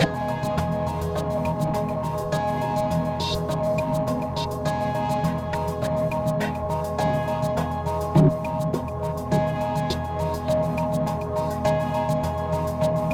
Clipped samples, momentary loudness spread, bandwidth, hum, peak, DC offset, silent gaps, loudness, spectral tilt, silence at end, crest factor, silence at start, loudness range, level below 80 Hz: under 0.1%; 3 LU; 17 kHz; none; -6 dBFS; under 0.1%; none; -25 LUFS; -7 dB/octave; 0 s; 18 dB; 0 s; 2 LU; -40 dBFS